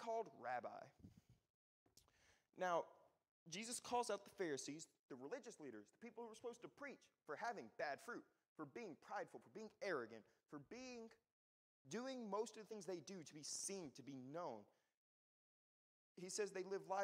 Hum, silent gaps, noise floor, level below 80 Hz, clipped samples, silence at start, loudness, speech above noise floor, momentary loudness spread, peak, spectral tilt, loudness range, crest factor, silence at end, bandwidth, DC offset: none; 1.50-1.86 s, 3.29-3.46 s, 4.99-5.09 s, 8.48-8.56 s, 11.32-11.85 s, 14.94-16.15 s; -78 dBFS; under -90 dBFS; under 0.1%; 0 s; -51 LUFS; 27 dB; 14 LU; -30 dBFS; -3 dB/octave; 5 LU; 22 dB; 0 s; 15.5 kHz; under 0.1%